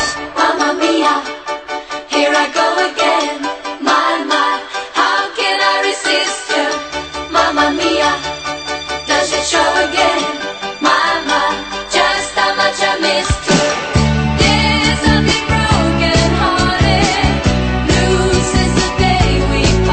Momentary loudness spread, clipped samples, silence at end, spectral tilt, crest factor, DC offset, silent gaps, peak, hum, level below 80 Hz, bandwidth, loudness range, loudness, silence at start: 8 LU; under 0.1%; 0 s; -4 dB/octave; 14 dB; under 0.1%; none; 0 dBFS; none; -26 dBFS; 8.8 kHz; 3 LU; -14 LUFS; 0 s